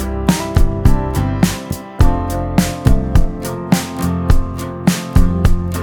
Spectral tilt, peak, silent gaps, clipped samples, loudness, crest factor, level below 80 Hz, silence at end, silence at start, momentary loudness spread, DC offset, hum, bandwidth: -6 dB/octave; 0 dBFS; none; under 0.1%; -17 LUFS; 14 dB; -16 dBFS; 0 s; 0 s; 5 LU; under 0.1%; none; 19 kHz